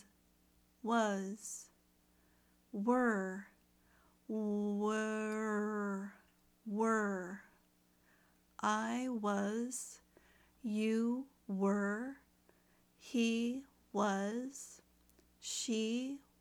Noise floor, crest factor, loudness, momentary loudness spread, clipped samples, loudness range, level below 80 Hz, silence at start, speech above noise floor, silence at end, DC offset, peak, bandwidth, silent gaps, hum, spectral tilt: -72 dBFS; 18 dB; -38 LUFS; 14 LU; under 0.1%; 2 LU; -78 dBFS; 0.85 s; 35 dB; 0.2 s; under 0.1%; -20 dBFS; 16 kHz; none; none; -4.5 dB/octave